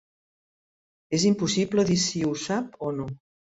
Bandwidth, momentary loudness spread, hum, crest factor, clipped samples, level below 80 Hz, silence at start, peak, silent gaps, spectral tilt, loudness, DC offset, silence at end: 8.2 kHz; 11 LU; none; 16 dB; under 0.1%; -60 dBFS; 1.1 s; -10 dBFS; none; -4.5 dB/octave; -25 LUFS; under 0.1%; 0.45 s